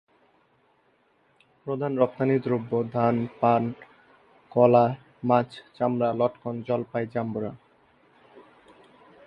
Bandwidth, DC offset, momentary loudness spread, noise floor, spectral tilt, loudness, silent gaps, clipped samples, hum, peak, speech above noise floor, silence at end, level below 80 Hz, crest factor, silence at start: 5.6 kHz; under 0.1%; 13 LU; -65 dBFS; -10 dB/octave; -25 LUFS; none; under 0.1%; none; -4 dBFS; 41 dB; 0.85 s; -68 dBFS; 22 dB; 1.65 s